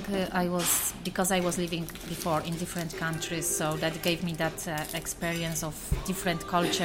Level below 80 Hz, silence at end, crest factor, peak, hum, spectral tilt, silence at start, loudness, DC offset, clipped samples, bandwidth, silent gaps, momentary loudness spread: -46 dBFS; 0 s; 18 dB; -12 dBFS; none; -3.5 dB/octave; 0 s; -30 LUFS; under 0.1%; under 0.1%; 16.5 kHz; none; 7 LU